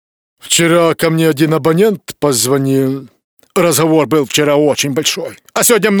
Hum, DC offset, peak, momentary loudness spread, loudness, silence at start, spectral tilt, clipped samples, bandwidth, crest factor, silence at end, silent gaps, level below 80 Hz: none; under 0.1%; 0 dBFS; 7 LU; -12 LUFS; 0.45 s; -4 dB/octave; under 0.1%; over 20 kHz; 12 dB; 0 s; 3.24-3.37 s; -56 dBFS